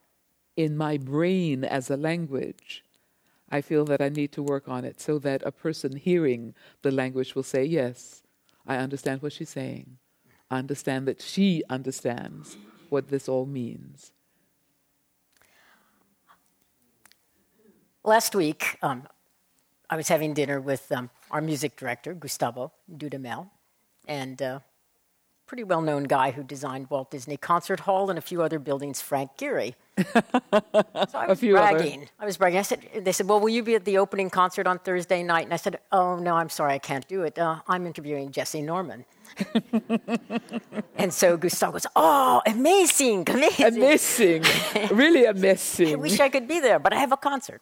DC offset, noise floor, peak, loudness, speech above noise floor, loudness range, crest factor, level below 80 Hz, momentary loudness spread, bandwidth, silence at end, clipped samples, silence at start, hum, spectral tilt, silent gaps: under 0.1%; -71 dBFS; -6 dBFS; -25 LUFS; 46 dB; 13 LU; 18 dB; -70 dBFS; 15 LU; 17.5 kHz; 0.05 s; under 0.1%; 0.55 s; none; -4 dB/octave; none